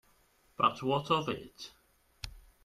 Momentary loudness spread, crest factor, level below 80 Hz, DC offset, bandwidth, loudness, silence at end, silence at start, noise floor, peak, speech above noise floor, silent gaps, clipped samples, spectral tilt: 19 LU; 22 dB; -60 dBFS; under 0.1%; 14.5 kHz; -32 LUFS; 0.25 s; 0.6 s; -68 dBFS; -14 dBFS; 36 dB; none; under 0.1%; -5.5 dB/octave